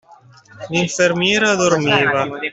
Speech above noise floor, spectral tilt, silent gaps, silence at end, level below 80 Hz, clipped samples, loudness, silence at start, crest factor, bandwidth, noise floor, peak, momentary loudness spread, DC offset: 30 dB; -3.5 dB/octave; none; 0 s; -56 dBFS; under 0.1%; -16 LUFS; 0.55 s; 16 dB; 8.4 kHz; -46 dBFS; -2 dBFS; 6 LU; under 0.1%